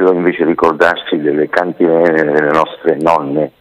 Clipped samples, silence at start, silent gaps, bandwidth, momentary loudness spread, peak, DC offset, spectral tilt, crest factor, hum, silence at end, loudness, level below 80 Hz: 0.3%; 0 s; none; 11 kHz; 4 LU; 0 dBFS; under 0.1%; -6.5 dB/octave; 12 dB; none; 0.1 s; -13 LUFS; -52 dBFS